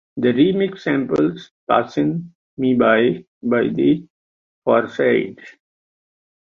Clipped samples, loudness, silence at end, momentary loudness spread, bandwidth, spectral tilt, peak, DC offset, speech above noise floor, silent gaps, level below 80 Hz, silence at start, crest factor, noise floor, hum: under 0.1%; -19 LUFS; 0.95 s; 11 LU; 7 kHz; -8 dB/octave; -2 dBFS; under 0.1%; over 72 dB; 1.51-1.67 s, 2.35-2.57 s, 3.28-3.41 s, 4.10-4.62 s; -58 dBFS; 0.15 s; 18 dB; under -90 dBFS; none